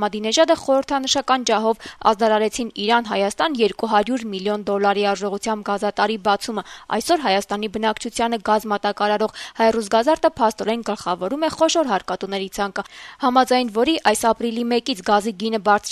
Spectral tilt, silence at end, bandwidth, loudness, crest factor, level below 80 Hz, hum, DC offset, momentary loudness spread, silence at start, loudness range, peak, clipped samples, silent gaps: -3.5 dB/octave; 0 s; 13.5 kHz; -20 LUFS; 18 dB; -54 dBFS; none; under 0.1%; 7 LU; 0 s; 2 LU; -2 dBFS; under 0.1%; none